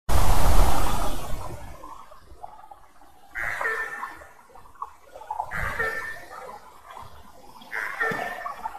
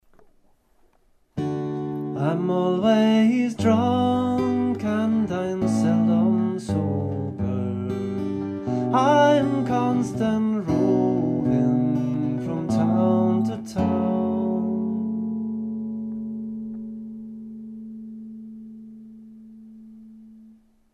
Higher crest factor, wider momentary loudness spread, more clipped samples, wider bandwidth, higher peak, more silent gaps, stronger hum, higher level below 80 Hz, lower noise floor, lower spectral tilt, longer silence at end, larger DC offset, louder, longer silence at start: about the same, 18 dB vs 16 dB; first, 24 LU vs 18 LU; neither; first, 14 kHz vs 9.4 kHz; about the same, -4 dBFS vs -6 dBFS; neither; neither; first, -32 dBFS vs -56 dBFS; second, -53 dBFS vs -61 dBFS; second, -4 dB/octave vs -7.5 dB/octave; second, 0 s vs 0.45 s; neither; second, -29 LUFS vs -23 LUFS; second, 0.05 s vs 1.35 s